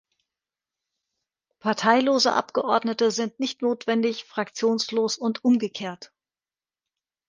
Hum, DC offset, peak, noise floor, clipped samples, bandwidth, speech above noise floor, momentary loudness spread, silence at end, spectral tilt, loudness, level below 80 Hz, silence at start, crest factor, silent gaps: none; under 0.1%; -4 dBFS; under -90 dBFS; under 0.1%; 9.8 kHz; over 66 dB; 11 LU; 1.25 s; -3.5 dB/octave; -24 LUFS; -74 dBFS; 1.65 s; 22 dB; none